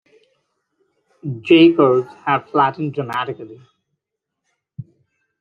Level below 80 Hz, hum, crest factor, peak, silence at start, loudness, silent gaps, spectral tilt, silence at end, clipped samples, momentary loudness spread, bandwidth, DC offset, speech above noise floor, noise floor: -68 dBFS; none; 18 dB; -2 dBFS; 1.25 s; -16 LUFS; none; -8 dB/octave; 0.6 s; under 0.1%; 27 LU; 5 kHz; under 0.1%; 64 dB; -80 dBFS